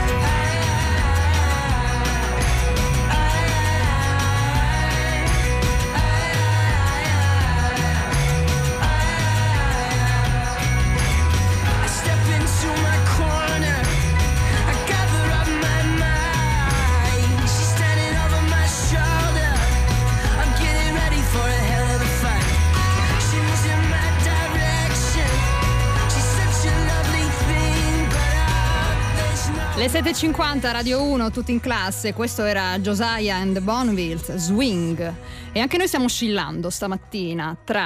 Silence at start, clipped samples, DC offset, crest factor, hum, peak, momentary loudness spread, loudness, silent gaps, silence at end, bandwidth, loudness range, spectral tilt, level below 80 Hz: 0 s; under 0.1%; under 0.1%; 10 dB; none; -8 dBFS; 3 LU; -20 LUFS; none; 0 s; 15.5 kHz; 3 LU; -4.5 dB/octave; -24 dBFS